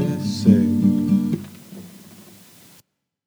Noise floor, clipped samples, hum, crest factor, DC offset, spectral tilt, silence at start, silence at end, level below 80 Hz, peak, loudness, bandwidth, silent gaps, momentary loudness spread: -58 dBFS; under 0.1%; none; 20 dB; under 0.1%; -7.5 dB/octave; 0 s; 1.05 s; -68 dBFS; -2 dBFS; -19 LUFS; over 20 kHz; none; 24 LU